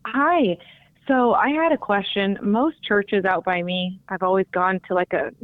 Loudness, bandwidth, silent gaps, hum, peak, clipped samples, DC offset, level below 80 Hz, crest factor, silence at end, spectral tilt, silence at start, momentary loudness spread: -21 LUFS; 4.5 kHz; none; none; -6 dBFS; under 0.1%; under 0.1%; -60 dBFS; 14 dB; 0.15 s; -8.5 dB/octave; 0.05 s; 7 LU